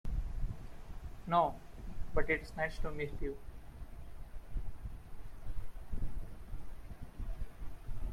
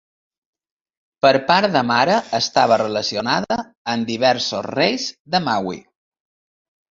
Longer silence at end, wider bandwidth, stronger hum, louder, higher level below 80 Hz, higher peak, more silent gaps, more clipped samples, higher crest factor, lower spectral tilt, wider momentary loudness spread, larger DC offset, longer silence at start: second, 0 s vs 1.15 s; first, 11 kHz vs 7.8 kHz; neither; second, -41 LUFS vs -18 LUFS; first, -42 dBFS vs -60 dBFS; second, -16 dBFS vs -2 dBFS; second, none vs 3.77-3.85 s, 5.20-5.25 s; neither; about the same, 20 dB vs 18 dB; first, -6.5 dB/octave vs -4 dB/octave; first, 18 LU vs 9 LU; neither; second, 0.05 s vs 1.25 s